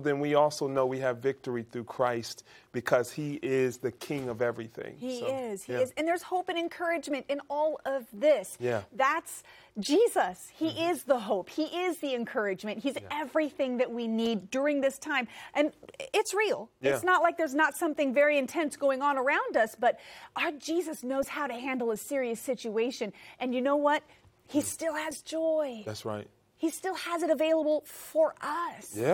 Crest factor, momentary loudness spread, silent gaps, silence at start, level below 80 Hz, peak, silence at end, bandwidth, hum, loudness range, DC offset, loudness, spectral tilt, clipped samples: 22 dB; 10 LU; none; 0 s; -74 dBFS; -8 dBFS; 0 s; 18 kHz; none; 5 LU; under 0.1%; -30 LUFS; -4.5 dB/octave; under 0.1%